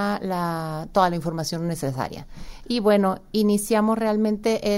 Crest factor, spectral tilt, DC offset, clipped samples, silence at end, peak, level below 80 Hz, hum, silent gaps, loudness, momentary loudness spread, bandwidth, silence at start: 18 dB; -5.5 dB/octave; under 0.1%; under 0.1%; 0 s; -6 dBFS; -46 dBFS; none; none; -23 LUFS; 9 LU; 16 kHz; 0 s